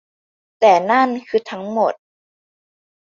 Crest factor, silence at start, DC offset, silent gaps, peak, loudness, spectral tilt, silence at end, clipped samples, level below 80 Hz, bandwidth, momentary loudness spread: 18 dB; 0.6 s; under 0.1%; none; -2 dBFS; -17 LUFS; -5 dB/octave; 1.1 s; under 0.1%; -70 dBFS; 7.4 kHz; 10 LU